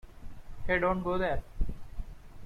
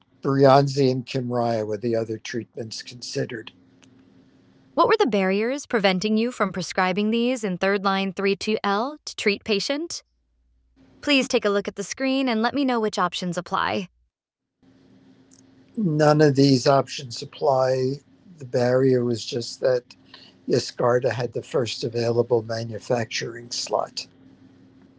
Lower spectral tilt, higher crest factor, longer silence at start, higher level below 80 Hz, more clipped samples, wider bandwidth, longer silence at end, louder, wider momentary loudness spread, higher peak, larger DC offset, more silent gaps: first, -7.5 dB/octave vs -5.5 dB/octave; about the same, 18 dB vs 20 dB; second, 0.05 s vs 0.25 s; first, -38 dBFS vs -64 dBFS; neither; second, 5.4 kHz vs 8 kHz; second, 0 s vs 0.95 s; second, -32 LUFS vs -23 LUFS; first, 23 LU vs 13 LU; second, -14 dBFS vs -2 dBFS; neither; neither